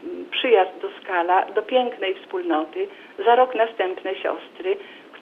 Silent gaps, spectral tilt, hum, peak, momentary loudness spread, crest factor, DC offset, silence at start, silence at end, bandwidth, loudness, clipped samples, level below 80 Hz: none; -4.5 dB/octave; none; -4 dBFS; 12 LU; 18 dB; under 0.1%; 0 s; 0 s; 5 kHz; -22 LUFS; under 0.1%; -74 dBFS